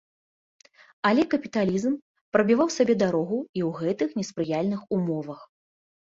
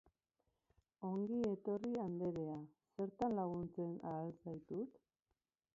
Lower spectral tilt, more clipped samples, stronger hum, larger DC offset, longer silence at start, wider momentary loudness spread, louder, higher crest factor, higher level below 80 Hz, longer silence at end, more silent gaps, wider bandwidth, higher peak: second, -6 dB/octave vs -9 dB/octave; neither; neither; neither; about the same, 1.05 s vs 1 s; about the same, 8 LU vs 10 LU; first, -25 LUFS vs -44 LUFS; about the same, 20 dB vs 18 dB; first, -66 dBFS vs -76 dBFS; second, 0.6 s vs 0.8 s; first, 2.02-2.15 s, 2.21-2.32 s, 3.49-3.54 s vs none; about the same, 7.8 kHz vs 7.4 kHz; first, -6 dBFS vs -28 dBFS